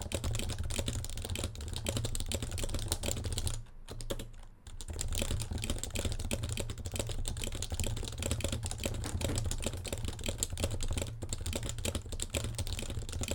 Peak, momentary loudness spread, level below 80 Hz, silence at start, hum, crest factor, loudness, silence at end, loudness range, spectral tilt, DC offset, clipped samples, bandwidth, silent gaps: -10 dBFS; 5 LU; -40 dBFS; 0 s; none; 26 dB; -37 LUFS; 0 s; 2 LU; -3.5 dB/octave; under 0.1%; under 0.1%; 18 kHz; none